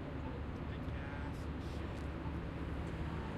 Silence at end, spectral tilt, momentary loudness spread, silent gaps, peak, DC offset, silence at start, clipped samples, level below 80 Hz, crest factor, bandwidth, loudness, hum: 0 s; -7.5 dB/octave; 2 LU; none; -30 dBFS; under 0.1%; 0 s; under 0.1%; -46 dBFS; 12 dB; 11.5 kHz; -43 LUFS; none